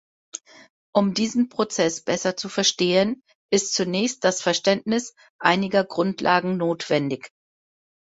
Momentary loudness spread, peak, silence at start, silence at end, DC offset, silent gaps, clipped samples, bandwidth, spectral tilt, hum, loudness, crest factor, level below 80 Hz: 10 LU; -2 dBFS; 0.35 s; 0.9 s; under 0.1%; 0.70-0.93 s, 3.35-3.49 s, 5.30-5.39 s; under 0.1%; 8 kHz; -3.5 dB/octave; none; -22 LUFS; 22 dB; -64 dBFS